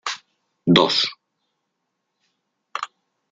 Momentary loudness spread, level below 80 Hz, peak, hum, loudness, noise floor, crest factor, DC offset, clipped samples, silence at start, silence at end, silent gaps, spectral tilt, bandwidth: 19 LU; -68 dBFS; -2 dBFS; none; -20 LUFS; -77 dBFS; 24 dB; under 0.1%; under 0.1%; 0.05 s; 0.45 s; none; -4.5 dB/octave; 7.8 kHz